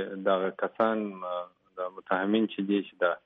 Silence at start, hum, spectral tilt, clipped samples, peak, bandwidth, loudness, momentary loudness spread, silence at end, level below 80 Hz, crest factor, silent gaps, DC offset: 0 s; none; -4 dB/octave; under 0.1%; -12 dBFS; 4.4 kHz; -30 LUFS; 11 LU; 0.05 s; -80 dBFS; 18 dB; none; under 0.1%